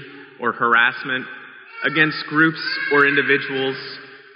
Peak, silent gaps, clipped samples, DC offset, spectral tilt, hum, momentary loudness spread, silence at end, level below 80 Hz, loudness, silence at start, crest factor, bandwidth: -2 dBFS; none; under 0.1%; under 0.1%; -2 dB/octave; none; 19 LU; 0.2 s; -72 dBFS; -18 LUFS; 0 s; 18 dB; 5.6 kHz